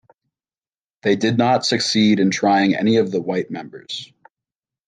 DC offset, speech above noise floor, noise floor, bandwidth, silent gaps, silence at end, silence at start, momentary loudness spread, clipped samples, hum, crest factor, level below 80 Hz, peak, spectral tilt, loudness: under 0.1%; over 72 dB; under -90 dBFS; 9.6 kHz; none; 0.85 s; 1.05 s; 14 LU; under 0.1%; none; 16 dB; -66 dBFS; -4 dBFS; -5 dB/octave; -18 LUFS